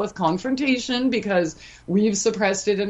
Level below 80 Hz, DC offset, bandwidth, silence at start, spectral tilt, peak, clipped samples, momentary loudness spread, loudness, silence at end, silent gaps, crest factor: -54 dBFS; under 0.1%; 8.4 kHz; 0 s; -4.5 dB/octave; -6 dBFS; under 0.1%; 3 LU; -22 LUFS; 0 s; none; 16 dB